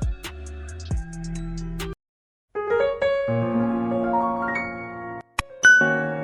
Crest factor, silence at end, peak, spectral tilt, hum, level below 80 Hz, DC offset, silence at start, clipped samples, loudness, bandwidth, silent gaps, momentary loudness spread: 20 dB; 0 s; -4 dBFS; -4.5 dB/octave; none; -38 dBFS; under 0.1%; 0 s; under 0.1%; -22 LUFS; 14 kHz; 2.09-2.48 s; 19 LU